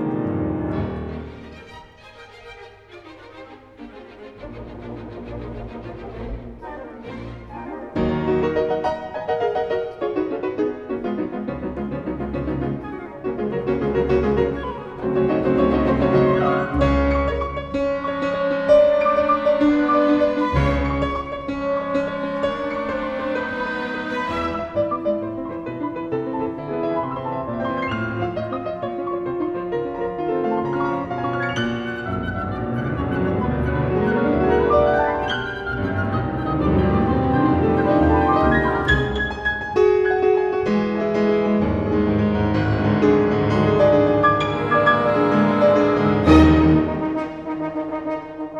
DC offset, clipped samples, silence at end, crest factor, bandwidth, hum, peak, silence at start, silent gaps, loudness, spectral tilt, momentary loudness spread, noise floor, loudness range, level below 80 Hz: under 0.1%; under 0.1%; 0 s; 20 dB; 7.8 kHz; none; 0 dBFS; 0 s; none; -20 LUFS; -8 dB/octave; 17 LU; -44 dBFS; 14 LU; -36 dBFS